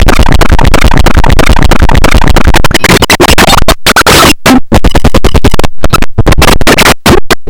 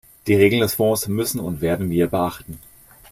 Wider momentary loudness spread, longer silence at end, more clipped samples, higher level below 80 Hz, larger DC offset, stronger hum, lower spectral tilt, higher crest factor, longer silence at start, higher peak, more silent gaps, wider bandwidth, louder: second, 6 LU vs 15 LU; second, 0 s vs 0.55 s; first, 40% vs under 0.1%; first, -8 dBFS vs -48 dBFS; neither; neither; second, -4 dB/octave vs -5.5 dB/octave; second, 2 dB vs 18 dB; second, 0 s vs 0.25 s; about the same, 0 dBFS vs -2 dBFS; neither; first, over 20 kHz vs 16 kHz; first, -5 LUFS vs -20 LUFS